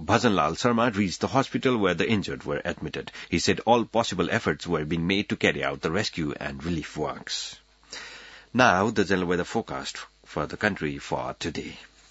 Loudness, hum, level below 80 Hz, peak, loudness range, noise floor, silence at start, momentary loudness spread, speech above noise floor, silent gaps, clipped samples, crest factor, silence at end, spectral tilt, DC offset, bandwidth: -26 LUFS; none; -54 dBFS; -4 dBFS; 3 LU; -46 dBFS; 0 s; 14 LU; 20 dB; none; under 0.1%; 22 dB; 0.25 s; -5 dB/octave; under 0.1%; 8 kHz